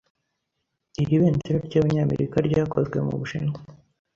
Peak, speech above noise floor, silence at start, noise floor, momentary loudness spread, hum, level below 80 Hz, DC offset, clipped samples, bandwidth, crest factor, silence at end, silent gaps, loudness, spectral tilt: -8 dBFS; 56 dB; 1 s; -79 dBFS; 9 LU; none; -50 dBFS; under 0.1%; under 0.1%; 7.2 kHz; 16 dB; 0.4 s; none; -24 LUFS; -8.5 dB/octave